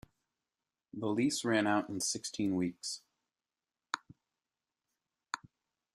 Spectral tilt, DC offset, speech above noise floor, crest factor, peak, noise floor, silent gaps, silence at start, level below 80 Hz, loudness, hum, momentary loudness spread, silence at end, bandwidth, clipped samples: -3.5 dB/octave; under 0.1%; over 56 dB; 26 dB; -12 dBFS; under -90 dBFS; none; 0.95 s; -74 dBFS; -35 LUFS; none; 14 LU; 0.6 s; 13.5 kHz; under 0.1%